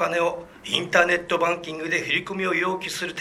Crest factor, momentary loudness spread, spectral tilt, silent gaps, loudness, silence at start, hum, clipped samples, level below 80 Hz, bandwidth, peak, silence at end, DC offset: 22 dB; 8 LU; -3.5 dB/octave; none; -23 LUFS; 0 s; none; under 0.1%; -60 dBFS; 14.5 kHz; -2 dBFS; 0 s; under 0.1%